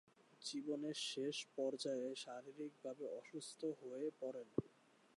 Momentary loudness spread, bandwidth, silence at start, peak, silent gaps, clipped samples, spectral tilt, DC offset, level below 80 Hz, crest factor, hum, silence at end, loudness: 8 LU; 11.5 kHz; 0.3 s; -24 dBFS; none; under 0.1%; -4 dB/octave; under 0.1%; -84 dBFS; 24 dB; none; 0.5 s; -47 LUFS